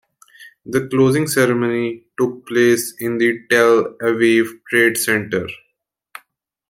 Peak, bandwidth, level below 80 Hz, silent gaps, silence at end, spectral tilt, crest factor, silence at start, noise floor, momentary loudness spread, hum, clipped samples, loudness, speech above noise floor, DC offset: -2 dBFS; 16.5 kHz; -60 dBFS; none; 1.15 s; -4.5 dB/octave; 16 dB; 0.4 s; -71 dBFS; 8 LU; none; under 0.1%; -17 LUFS; 54 dB; under 0.1%